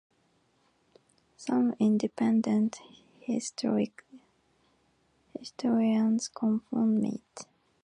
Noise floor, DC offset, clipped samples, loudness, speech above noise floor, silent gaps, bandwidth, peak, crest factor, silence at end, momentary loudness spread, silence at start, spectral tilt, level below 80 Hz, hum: -70 dBFS; under 0.1%; under 0.1%; -29 LUFS; 42 dB; none; 10 kHz; -16 dBFS; 14 dB; 0.4 s; 18 LU; 1.4 s; -6 dB/octave; -74 dBFS; none